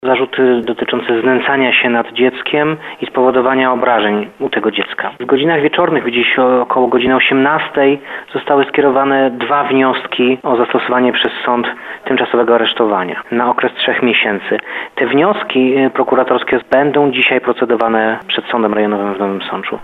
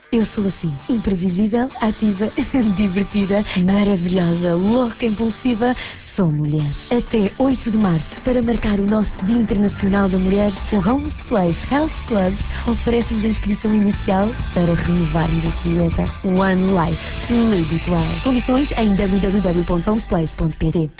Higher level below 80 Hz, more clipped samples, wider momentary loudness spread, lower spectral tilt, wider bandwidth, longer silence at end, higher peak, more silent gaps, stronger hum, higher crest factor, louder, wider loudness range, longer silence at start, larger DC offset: second, -56 dBFS vs -30 dBFS; neither; about the same, 7 LU vs 5 LU; second, -7 dB/octave vs -12 dB/octave; about the same, 4.4 kHz vs 4 kHz; about the same, 0 s vs 0.1 s; first, 0 dBFS vs -6 dBFS; neither; neither; about the same, 14 dB vs 12 dB; first, -13 LUFS vs -19 LUFS; about the same, 2 LU vs 1 LU; about the same, 0 s vs 0.1 s; neither